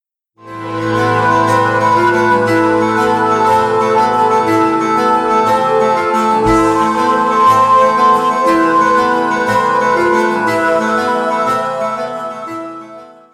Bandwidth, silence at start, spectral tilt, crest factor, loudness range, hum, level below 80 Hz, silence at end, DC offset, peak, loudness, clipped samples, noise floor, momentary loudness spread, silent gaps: 15 kHz; 0.45 s; -5.5 dB/octave; 12 dB; 3 LU; none; -42 dBFS; 0.25 s; under 0.1%; 0 dBFS; -12 LUFS; under 0.1%; -40 dBFS; 9 LU; none